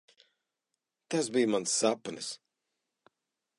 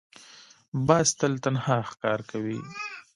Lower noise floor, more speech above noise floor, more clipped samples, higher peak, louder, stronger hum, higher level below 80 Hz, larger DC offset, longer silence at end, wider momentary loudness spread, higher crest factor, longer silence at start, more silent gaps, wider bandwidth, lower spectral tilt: first, -87 dBFS vs -53 dBFS; first, 56 dB vs 27 dB; neither; second, -14 dBFS vs -6 dBFS; second, -31 LUFS vs -27 LUFS; neither; second, -82 dBFS vs -62 dBFS; neither; first, 1.25 s vs 0.15 s; about the same, 12 LU vs 14 LU; about the same, 20 dB vs 22 dB; first, 1.1 s vs 0.2 s; second, none vs 0.68-0.72 s; about the same, 11.5 kHz vs 11.5 kHz; second, -3 dB/octave vs -4.5 dB/octave